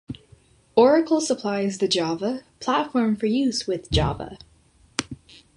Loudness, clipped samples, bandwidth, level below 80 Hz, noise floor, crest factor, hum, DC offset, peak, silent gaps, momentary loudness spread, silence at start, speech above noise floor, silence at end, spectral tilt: -23 LUFS; under 0.1%; 11.5 kHz; -42 dBFS; -57 dBFS; 20 dB; none; under 0.1%; -4 dBFS; none; 18 LU; 0.1 s; 35 dB; 0.4 s; -5 dB/octave